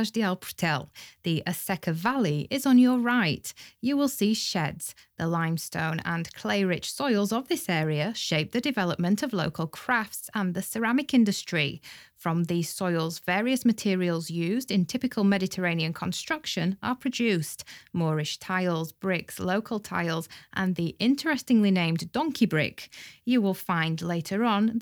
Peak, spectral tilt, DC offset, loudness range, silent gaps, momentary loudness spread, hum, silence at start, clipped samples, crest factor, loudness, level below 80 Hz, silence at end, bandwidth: -10 dBFS; -5 dB/octave; under 0.1%; 3 LU; none; 8 LU; none; 0 s; under 0.1%; 16 dB; -27 LUFS; -64 dBFS; 0 s; over 20 kHz